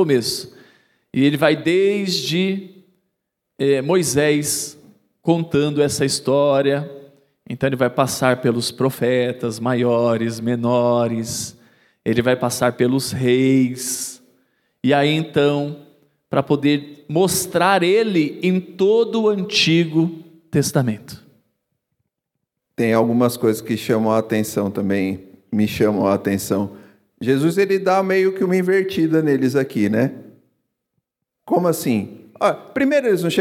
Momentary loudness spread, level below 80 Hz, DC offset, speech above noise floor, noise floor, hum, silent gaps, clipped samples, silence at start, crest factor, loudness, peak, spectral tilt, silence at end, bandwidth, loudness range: 8 LU; -60 dBFS; under 0.1%; 61 dB; -79 dBFS; none; none; under 0.1%; 0 s; 18 dB; -19 LUFS; 0 dBFS; -5 dB/octave; 0 s; 16.5 kHz; 3 LU